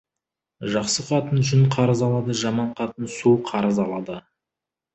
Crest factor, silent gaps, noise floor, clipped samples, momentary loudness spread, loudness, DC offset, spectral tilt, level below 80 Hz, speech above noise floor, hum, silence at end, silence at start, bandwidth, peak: 16 dB; none; -87 dBFS; under 0.1%; 11 LU; -22 LUFS; under 0.1%; -6 dB/octave; -56 dBFS; 66 dB; none; 0.75 s; 0.6 s; 8.4 kHz; -6 dBFS